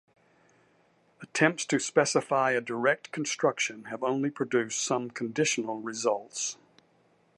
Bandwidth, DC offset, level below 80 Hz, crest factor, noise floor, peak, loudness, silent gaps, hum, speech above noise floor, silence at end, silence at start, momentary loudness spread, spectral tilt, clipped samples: 11.5 kHz; under 0.1%; -80 dBFS; 22 dB; -66 dBFS; -8 dBFS; -28 LUFS; none; none; 38 dB; 0.85 s; 1.2 s; 8 LU; -3.5 dB/octave; under 0.1%